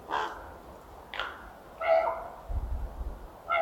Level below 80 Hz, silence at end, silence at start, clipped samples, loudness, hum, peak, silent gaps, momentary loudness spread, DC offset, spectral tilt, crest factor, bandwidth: -42 dBFS; 0 s; 0 s; under 0.1%; -33 LUFS; none; -14 dBFS; none; 21 LU; under 0.1%; -5.5 dB/octave; 20 dB; 18 kHz